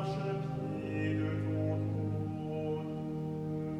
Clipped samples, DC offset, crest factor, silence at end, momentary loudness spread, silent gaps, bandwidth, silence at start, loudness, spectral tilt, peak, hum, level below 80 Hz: under 0.1%; under 0.1%; 12 dB; 0 s; 4 LU; none; 8.4 kHz; 0 s; -36 LUFS; -9 dB/octave; -22 dBFS; none; -60 dBFS